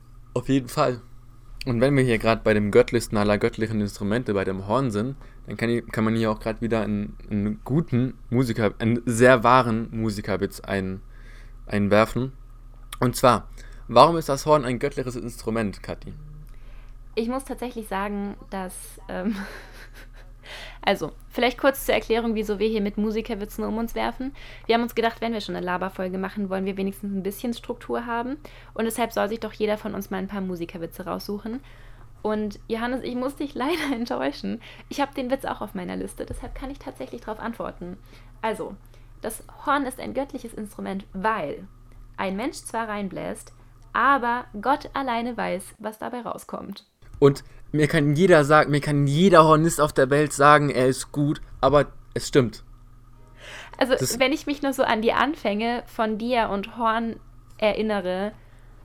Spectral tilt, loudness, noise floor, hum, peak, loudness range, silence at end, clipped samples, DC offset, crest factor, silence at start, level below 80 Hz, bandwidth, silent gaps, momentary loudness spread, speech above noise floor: -5.5 dB/octave; -24 LUFS; -47 dBFS; none; 0 dBFS; 12 LU; 0.15 s; under 0.1%; under 0.1%; 24 dB; 0.05 s; -44 dBFS; 16 kHz; none; 16 LU; 24 dB